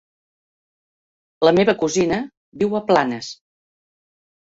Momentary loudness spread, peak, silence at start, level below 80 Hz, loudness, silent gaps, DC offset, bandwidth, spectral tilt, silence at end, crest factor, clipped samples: 14 LU; -2 dBFS; 1.4 s; -56 dBFS; -19 LUFS; 2.37-2.52 s; under 0.1%; 8 kHz; -5 dB/octave; 1.05 s; 20 dB; under 0.1%